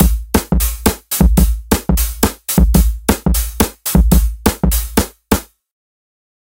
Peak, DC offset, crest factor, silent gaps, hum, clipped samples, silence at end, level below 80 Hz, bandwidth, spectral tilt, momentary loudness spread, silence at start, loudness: 0 dBFS; under 0.1%; 14 dB; none; none; under 0.1%; 1.05 s; -16 dBFS; 17.5 kHz; -5 dB/octave; 6 LU; 0 s; -15 LUFS